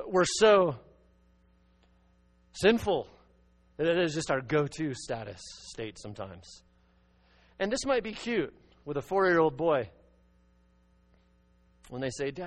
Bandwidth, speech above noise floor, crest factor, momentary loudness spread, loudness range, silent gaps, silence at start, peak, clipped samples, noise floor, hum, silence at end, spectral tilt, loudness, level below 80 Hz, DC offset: 10 kHz; 36 dB; 22 dB; 19 LU; 6 LU; none; 0 s; -10 dBFS; under 0.1%; -65 dBFS; none; 0 s; -4.5 dB/octave; -29 LUFS; -58 dBFS; under 0.1%